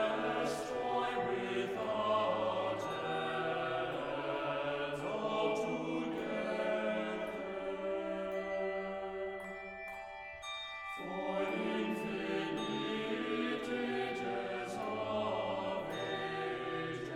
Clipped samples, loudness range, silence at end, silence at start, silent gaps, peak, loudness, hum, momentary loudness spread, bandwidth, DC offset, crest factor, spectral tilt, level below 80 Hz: under 0.1%; 5 LU; 0 s; 0 s; none; -22 dBFS; -37 LUFS; none; 7 LU; 15.5 kHz; under 0.1%; 16 dB; -5 dB/octave; -66 dBFS